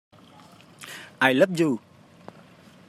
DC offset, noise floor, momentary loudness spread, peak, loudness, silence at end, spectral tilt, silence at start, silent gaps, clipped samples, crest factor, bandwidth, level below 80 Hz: under 0.1%; -51 dBFS; 21 LU; -4 dBFS; -22 LUFS; 1.1 s; -5.5 dB/octave; 0.8 s; none; under 0.1%; 22 dB; 15.5 kHz; -76 dBFS